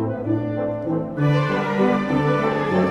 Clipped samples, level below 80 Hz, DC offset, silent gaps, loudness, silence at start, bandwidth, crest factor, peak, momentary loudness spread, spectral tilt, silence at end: under 0.1%; -50 dBFS; under 0.1%; none; -21 LUFS; 0 s; 9 kHz; 14 dB; -8 dBFS; 5 LU; -8 dB/octave; 0 s